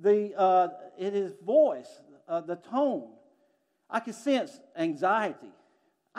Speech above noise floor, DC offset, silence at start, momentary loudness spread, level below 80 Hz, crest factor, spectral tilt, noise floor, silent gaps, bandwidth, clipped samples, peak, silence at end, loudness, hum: 44 dB; under 0.1%; 0 s; 12 LU; under -90 dBFS; 16 dB; -5.5 dB/octave; -71 dBFS; none; 11.5 kHz; under 0.1%; -12 dBFS; 0.7 s; -28 LUFS; none